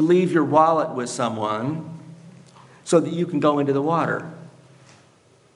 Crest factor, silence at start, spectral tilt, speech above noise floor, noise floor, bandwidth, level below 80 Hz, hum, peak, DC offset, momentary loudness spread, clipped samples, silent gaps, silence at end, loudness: 18 dB; 0 s; -6.5 dB/octave; 36 dB; -56 dBFS; 11.5 kHz; -72 dBFS; none; -4 dBFS; under 0.1%; 17 LU; under 0.1%; none; 1.05 s; -21 LUFS